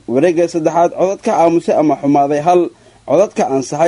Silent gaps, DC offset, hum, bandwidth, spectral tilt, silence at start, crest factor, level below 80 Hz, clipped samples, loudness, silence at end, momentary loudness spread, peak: none; under 0.1%; none; 11 kHz; -6.5 dB/octave; 0.1 s; 12 dB; -56 dBFS; under 0.1%; -14 LUFS; 0 s; 4 LU; 0 dBFS